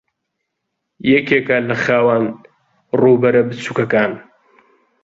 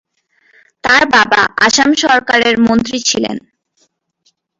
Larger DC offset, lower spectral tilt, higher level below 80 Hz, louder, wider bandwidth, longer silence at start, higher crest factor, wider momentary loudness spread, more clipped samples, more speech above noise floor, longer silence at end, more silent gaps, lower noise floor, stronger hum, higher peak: neither; first, -7 dB/octave vs -2 dB/octave; second, -58 dBFS vs -48 dBFS; second, -15 LUFS vs -11 LUFS; about the same, 7.8 kHz vs 8 kHz; first, 1.05 s vs 0.85 s; about the same, 16 dB vs 14 dB; about the same, 9 LU vs 9 LU; neither; first, 61 dB vs 49 dB; second, 0.8 s vs 1.2 s; neither; first, -75 dBFS vs -60 dBFS; neither; about the same, -2 dBFS vs 0 dBFS